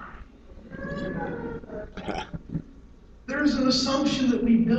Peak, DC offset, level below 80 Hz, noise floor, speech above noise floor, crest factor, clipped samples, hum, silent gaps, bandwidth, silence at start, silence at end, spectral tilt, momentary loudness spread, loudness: -10 dBFS; under 0.1%; -46 dBFS; -49 dBFS; 27 dB; 16 dB; under 0.1%; none; none; 8.2 kHz; 0 s; 0 s; -5 dB/octave; 17 LU; -27 LUFS